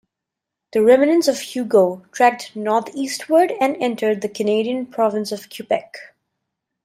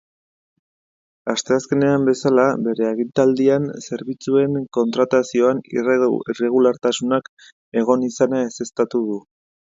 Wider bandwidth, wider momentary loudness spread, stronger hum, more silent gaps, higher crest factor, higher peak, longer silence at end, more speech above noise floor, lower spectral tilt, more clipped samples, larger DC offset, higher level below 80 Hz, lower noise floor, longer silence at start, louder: first, 16 kHz vs 7.8 kHz; first, 11 LU vs 8 LU; neither; second, none vs 7.29-7.37 s, 7.52-7.72 s; about the same, 16 dB vs 18 dB; about the same, -2 dBFS vs -2 dBFS; first, 0.8 s vs 0.55 s; second, 65 dB vs over 72 dB; about the same, -4.5 dB/octave vs -5.5 dB/octave; neither; neither; second, -70 dBFS vs -62 dBFS; second, -83 dBFS vs under -90 dBFS; second, 0.75 s vs 1.25 s; about the same, -19 LUFS vs -19 LUFS